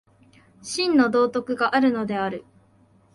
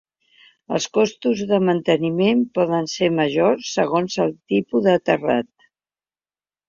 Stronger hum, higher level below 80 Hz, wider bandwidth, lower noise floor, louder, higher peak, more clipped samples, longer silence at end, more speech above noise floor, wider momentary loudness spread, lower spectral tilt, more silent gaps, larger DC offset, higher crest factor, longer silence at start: neither; about the same, -66 dBFS vs -62 dBFS; first, 11.5 kHz vs 7.6 kHz; second, -58 dBFS vs under -90 dBFS; about the same, -22 LUFS vs -20 LUFS; second, -6 dBFS vs -2 dBFS; neither; second, 0.75 s vs 1.25 s; second, 36 dB vs over 71 dB; first, 12 LU vs 5 LU; about the same, -4.5 dB/octave vs -5.5 dB/octave; neither; neither; about the same, 18 dB vs 18 dB; about the same, 0.65 s vs 0.7 s